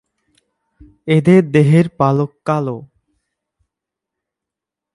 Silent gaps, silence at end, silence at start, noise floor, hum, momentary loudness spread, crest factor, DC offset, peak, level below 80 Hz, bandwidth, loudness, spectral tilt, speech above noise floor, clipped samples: none; 2.1 s; 1.05 s; -84 dBFS; none; 14 LU; 18 dB; under 0.1%; 0 dBFS; -54 dBFS; 11.5 kHz; -14 LUFS; -8.5 dB/octave; 71 dB; under 0.1%